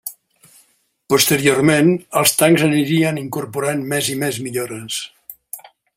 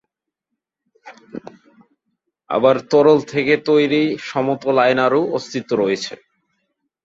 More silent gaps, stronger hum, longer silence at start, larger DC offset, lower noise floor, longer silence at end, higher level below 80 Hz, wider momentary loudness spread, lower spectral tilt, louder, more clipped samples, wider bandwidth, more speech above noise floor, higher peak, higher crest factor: neither; neither; second, 0.05 s vs 1.05 s; neither; second, -58 dBFS vs -80 dBFS; second, 0.35 s vs 0.9 s; first, -58 dBFS vs -64 dBFS; first, 19 LU vs 15 LU; second, -4 dB/octave vs -5.5 dB/octave; about the same, -17 LUFS vs -17 LUFS; neither; first, 16 kHz vs 7.8 kHz; second, 42 dB vs 64 dB; about the same, 0 dBFS vs -2 dBFS; about the same, 18 dB vs 18 dB